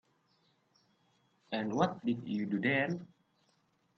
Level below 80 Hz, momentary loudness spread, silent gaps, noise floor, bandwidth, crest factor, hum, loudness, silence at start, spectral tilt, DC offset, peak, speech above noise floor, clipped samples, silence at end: -76 dBFS; 8 LU; none; -74 dBFS; 6.8 kHz; 20 dB; none; -34 LUFS; 1.5 s; -6.5 dB/octave; under 0.1%; -16 dBFS; 41 dB; under 0.1%; 0.9 s